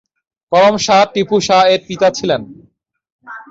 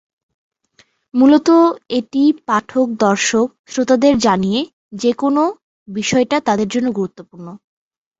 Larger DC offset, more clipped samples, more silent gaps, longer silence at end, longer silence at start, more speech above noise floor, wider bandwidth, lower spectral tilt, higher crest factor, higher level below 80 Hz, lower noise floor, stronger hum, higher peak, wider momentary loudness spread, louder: neither; neither; second, 3.12-3.19 s vs 3.59-3.64 s, 4.73-4.91 s, 5.63-5.86 s; second, 0.1 s vs 0.65 s; second, 0.5 s vs 1.15 s; about the same, 42 dB vs 41 dB; about the same, 7.8 kHz vs 8 kHz; about the same, -4 dB/octave vs -4.5 dB/octave; about the same, 12 dB vs 14 dB; about the same, -54 dBFS vs -54 dBFS; about the same, -55 dBFS vs -56 dBFS; neither; about the same, -2 dBFS vs -2 dBFS; second, 9 LU vs 13 LU; first, -13 LUFS vs -16 LUFS